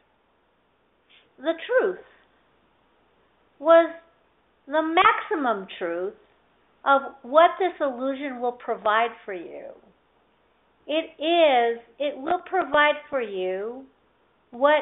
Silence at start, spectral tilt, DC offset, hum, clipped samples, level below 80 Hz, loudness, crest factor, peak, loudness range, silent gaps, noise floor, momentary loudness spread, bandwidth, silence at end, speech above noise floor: 1.4 s; -0.5 dB/octave; under 0.1%; none; under 0.1%; -70 dBFS; -23 LUFS; 22 dB; -4 dBFS; 6 LU; none; -66 dBFS; 14 LU; 4 kHz; 0 s; 43 dB